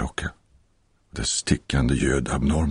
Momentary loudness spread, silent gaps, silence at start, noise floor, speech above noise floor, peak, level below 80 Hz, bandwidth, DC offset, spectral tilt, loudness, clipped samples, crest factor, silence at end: 11 LU; none; 0 s; -63 dBFS; 41 dB; -6 dBFS; -32 dBFS; 10.5 kHz; under 0.1%; -4.5 dB/octave; -24 LUFS; under 0.1%; 18 dB; 0 s